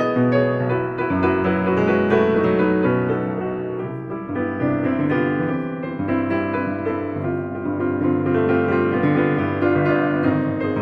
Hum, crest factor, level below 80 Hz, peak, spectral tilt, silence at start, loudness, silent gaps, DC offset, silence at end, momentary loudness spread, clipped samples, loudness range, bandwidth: none; 14 dB; -52 dBFS; -6 dBFS; -9.5 dB/octave; 0 s; -20 LUFS; none; under 0.1%; 0 s; 7 LU; under 0.1%; 4 LU; 6.2 kHz